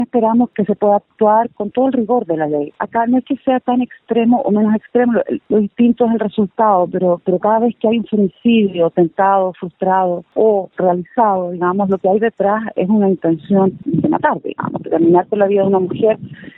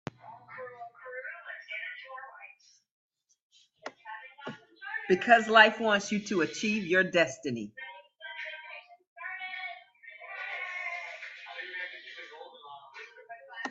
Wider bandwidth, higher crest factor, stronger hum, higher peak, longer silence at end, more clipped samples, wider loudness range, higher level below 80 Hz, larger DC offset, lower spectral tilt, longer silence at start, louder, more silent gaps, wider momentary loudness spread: second, 4 kHz vs 8.2 kHz; second, 14 dB vs 28 dB; neither; first, 0 dBFS vs -6 dBFS; about the same, 0.1 s vs 0 s; neither; second, 1 LU vs 18 LU; first, -58 dBFS vs -78 dBFS; neither; first, -11.5 dB/octave vs -4 dB/octave; second, 0 s vs 0.25 s; first, -15 LUFS vs -29 LUFS; second, none vs 2.91-3.10 s, 3.42-3.50 s, 9.07-9.16 s; second, 5 LU vs 24 LU